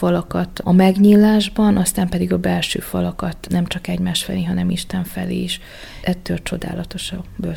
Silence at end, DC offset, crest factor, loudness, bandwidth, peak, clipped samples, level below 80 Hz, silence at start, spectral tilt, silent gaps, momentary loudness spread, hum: 0 s; under 0.1%; 18 dB; -18 LUFS; 17 kHz; 0 dBFS; under 0.1%; -38 dBFS; 0 s; -5.5 dB/octave; none; 14 LU; none